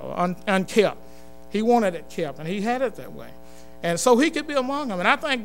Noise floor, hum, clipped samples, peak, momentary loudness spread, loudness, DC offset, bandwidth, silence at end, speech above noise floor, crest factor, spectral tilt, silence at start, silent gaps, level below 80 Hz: -47 dBFS; none; under 0.1%; -2 dBFS; 11 LU; -23 LUFS; 1%; 16 kHz; 0 s; 24 dB; 22 dB; -4.5 dB/octave; 0 s; none; -54 dBFS